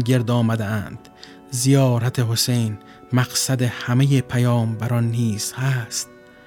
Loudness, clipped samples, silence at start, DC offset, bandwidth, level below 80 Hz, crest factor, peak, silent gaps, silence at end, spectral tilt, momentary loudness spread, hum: -20 LUFS; under 0.1%; 0 s; under 0.1%; 17.5 kHz; -56 dBFS; 16 dB; -4 dBFS; none; 0.4 s; -5 dB/octave; 10 LU; none